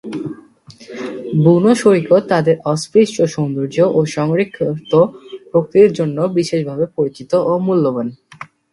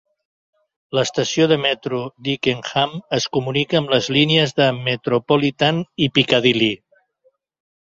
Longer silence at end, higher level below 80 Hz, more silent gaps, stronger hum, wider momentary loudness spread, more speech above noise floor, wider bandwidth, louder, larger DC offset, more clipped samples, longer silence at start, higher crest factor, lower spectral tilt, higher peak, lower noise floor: second, 0.3 s vs 1.15 s; about the same, -58 dBFS vs -58 dBFS; neither; neither; first, 16 LU vs 7 LU; second, 28 dB vs 44 dB; first, 11.5 kHz vs 7.8 kHz; first, -15 LUFS vs -18 LUFS; neither; neither; second, 0.05 s vs 0.9 s; about the same, 16 dB vs 18 dB; first, -7 dB/octave vs -5 dB/octave; about the same, 0 dBFS vs -2 dBFS; second, -42 dBFS vs -63 dBFS